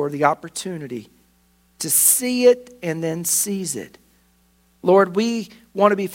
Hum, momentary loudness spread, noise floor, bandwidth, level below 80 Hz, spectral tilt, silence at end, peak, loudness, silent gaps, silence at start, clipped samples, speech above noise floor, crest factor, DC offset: none; 15 LU; -59 dBFS; 16.5 kHz; -64 dBFS; -3.5 dB/octave; 0 s; 0 dBFS; -19 LUFS; none; 0 s; under 0.1%; 40 dB; 20 dB; under 0.1%